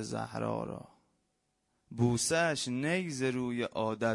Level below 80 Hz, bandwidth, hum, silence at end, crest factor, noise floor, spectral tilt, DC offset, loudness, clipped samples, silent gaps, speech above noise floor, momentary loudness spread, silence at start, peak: -66 dBFS; 11.5 kHz; none; 0 s; 18 dB; -79 dBFS; -4.5 dB/octave; under 0.1%; -33 LUFS; under 0.1%; none; 46 dB; 10 LU; 0 s; -16 dBFS